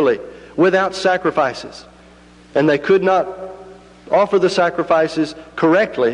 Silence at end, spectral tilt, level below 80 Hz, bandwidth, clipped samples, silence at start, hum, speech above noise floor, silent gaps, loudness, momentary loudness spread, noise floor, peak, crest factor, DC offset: 0 s; -5.5 dB/octave; -54 dBFS; 10.5 kHz; under 0.1%; 0 s; 60 Hz at -50 dBFS; 29 dB; none; -17 LUFS; 13 LU; -44 dBFS; -4 dBFS; 14 dB; under 0.1%